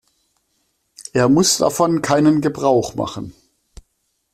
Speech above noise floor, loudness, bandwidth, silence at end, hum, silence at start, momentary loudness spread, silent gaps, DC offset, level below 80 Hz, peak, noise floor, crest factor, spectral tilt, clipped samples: 53 dB; -17 LUFS; 14.5 kHz; 1 s; none; 1 s; 16 LU; none; under 0.1%; -50 dBFS; -2 dBFS; -69 dBFS; 16 dB; -4.5 dB/octave; under 0.1%